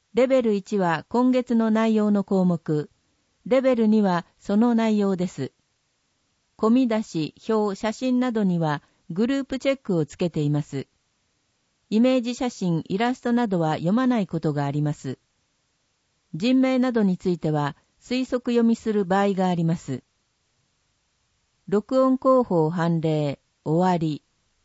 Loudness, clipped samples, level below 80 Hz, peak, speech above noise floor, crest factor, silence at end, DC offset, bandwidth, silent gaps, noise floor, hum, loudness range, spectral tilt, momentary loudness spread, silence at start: -23 LUFS; under 0.1%; -62 dBFS; -8 dBFS; 49 dB; 16 dB; 0.45 s; under 0.1%; 8 kHz; none; -71 dBFS; none; 3 LU; -7.5 dB/octave; 10 LU; 0.15 s